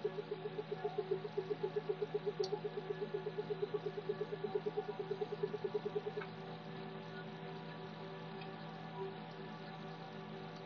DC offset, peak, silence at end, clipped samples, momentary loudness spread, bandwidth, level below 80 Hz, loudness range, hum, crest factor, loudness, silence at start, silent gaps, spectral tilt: under 0.1%; -26 dBFS; 0 s; under 0.1%; 8 LU; 6.6 kHz; under -90 dBFS; 6 LU; none; 18 dB; -44 LUFS; 0 s; none; -5 dB/octave